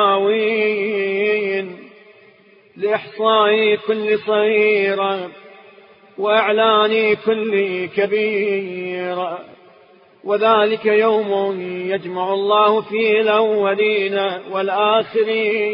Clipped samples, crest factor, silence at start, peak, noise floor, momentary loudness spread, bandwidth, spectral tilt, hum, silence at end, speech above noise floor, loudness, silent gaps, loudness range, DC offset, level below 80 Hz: under 0.1%; 16 dB; 0 s; -2 dBFS; -50 dBFS; 9 LU; 5.4 kHz; -9.5 dB/octave; none; 0 s; 33 dB; -17 LUFS; none; 3 LU; under 0.1%; -68 dBFS